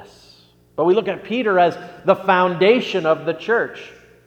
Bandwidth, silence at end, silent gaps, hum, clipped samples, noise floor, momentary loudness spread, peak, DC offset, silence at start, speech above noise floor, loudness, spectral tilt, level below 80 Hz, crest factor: 8.6 kHz; 0.35 s; none; none; under 0.1%; -51 dBFS; 9 LU; 0 dBFS; under 0.1%; 0 s; 33 dB; -18 LUFS; -6.5 dB/octave; -62 dBFS; 20 dB